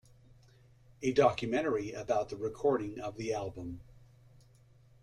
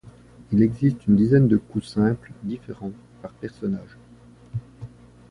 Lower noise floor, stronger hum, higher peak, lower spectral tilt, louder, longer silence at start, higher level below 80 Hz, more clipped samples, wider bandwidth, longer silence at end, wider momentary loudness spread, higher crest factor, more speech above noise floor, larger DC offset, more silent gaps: first, -62 dBFS vs -49 dBFS; second, none vs 60 Hz at -45 dBFS; second, -12 dBFS vs -6 dBFS; second, -6 dB/octave vs -9.5 dB/octave; second, -33 LUFS vs -22 LUFS; first, 1 s vs 0.5 s; second, -62 dBFS vs -50 dBFS; neither; about the same, 11 kHz vs 10.5 kHz; first, 1 s vs 0.45 s; second, 14 LU vs 23 LU; about the same, 22 dB vs 18 dB; about the same, 29 dB vs 27 dB; neither; neither